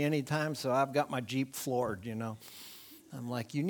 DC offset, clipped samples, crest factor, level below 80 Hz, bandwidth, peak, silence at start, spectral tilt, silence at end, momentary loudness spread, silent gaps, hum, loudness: under 0.1%; under 0.1%; 20 dB; -72 dBFS; 19.5 kHz; -14 dBFS; 0 s; -5.5 dB/octave; 0 s; 17 LU; none; none; -34 LUFS